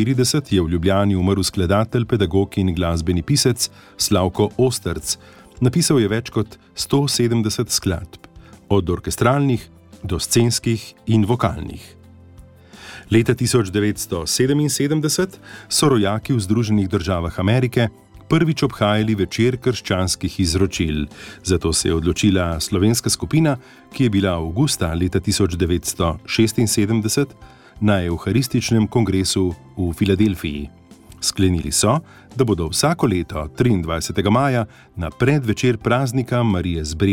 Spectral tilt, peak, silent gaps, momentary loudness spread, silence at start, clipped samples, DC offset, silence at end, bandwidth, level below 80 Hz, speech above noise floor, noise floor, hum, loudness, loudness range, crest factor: -5 dB/octave; -4 dBFS; none; 8 LU; 0 s; under 0.1%; under 0.1%; 0 s; 17.5 kHz; -38 dBFS; 25 dB; -44 dBFS; none; -19 LUFS; 2 LU; 16 dB